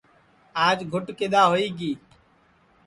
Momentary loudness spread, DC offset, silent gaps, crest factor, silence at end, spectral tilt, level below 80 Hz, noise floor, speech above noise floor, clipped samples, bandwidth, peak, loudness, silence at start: 13 LU; under 0.1%; none; 20 dB; 0.9 s; -5 dB/octave; -64 dBFS; -60 dBFS; 38 dB; under 0.1%; 11.5 kHz; -6 dBFS; -23 LUFS; 0.55 s